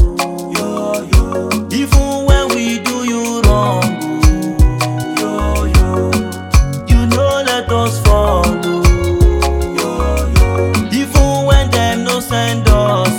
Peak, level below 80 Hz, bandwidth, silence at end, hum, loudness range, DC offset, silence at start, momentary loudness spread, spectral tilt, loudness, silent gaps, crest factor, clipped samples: 0 dBFS; -16 dBFS; 18 kHz; 0 s; none; 1 LU; under 0.1%; 0 s; 5 LU; -5.5 dB/octave; -14 LUFS; none; 12 dB; under 0.1%